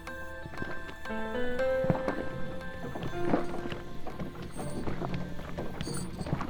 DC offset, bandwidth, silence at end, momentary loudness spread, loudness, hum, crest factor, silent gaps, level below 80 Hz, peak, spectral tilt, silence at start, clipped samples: under 0.1%; over 20 kHz; 0 s; 10 LU; -36 LUFS; none; 22 dB; none; -44 dBFS; -10 dBFS; -6 dB/octave; 0 s; under 0.1%